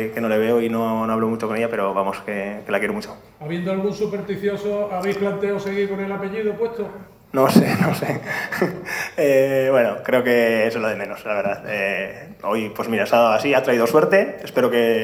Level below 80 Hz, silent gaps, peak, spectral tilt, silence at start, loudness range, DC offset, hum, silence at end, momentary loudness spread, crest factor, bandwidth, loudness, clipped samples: -58 dBFS; none; 0 dBFS; -6 dB/octave; 0 s; 5 LU; under 0.1%; none; 0 s; 10 LU; 20 dB; 16.5 kHz; -20 LUFS; under 0.1%